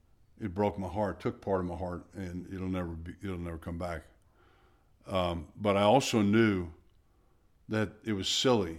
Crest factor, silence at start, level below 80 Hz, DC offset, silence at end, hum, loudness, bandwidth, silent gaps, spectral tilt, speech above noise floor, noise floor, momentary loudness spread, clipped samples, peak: 20 dB; 0.4 s; -54 dBFS; under 0.1%; 0 s; none; -32 LUFS; 15.5 kHz; none; -5 dB/octave; 35 dB; -66 dBFS; 15 LU; under 0.1%; -12 dBFS